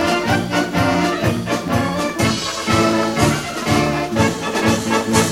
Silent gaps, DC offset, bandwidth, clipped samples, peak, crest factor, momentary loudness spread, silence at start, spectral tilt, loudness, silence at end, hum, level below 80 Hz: none; 0.1%; 16.5 kHz; under 0.1%; -2 dBFS; 16 dB; 4 LU; 0 s; -4.5 dB/octave; -18 LUFS; 0 s; none; -40 dBFS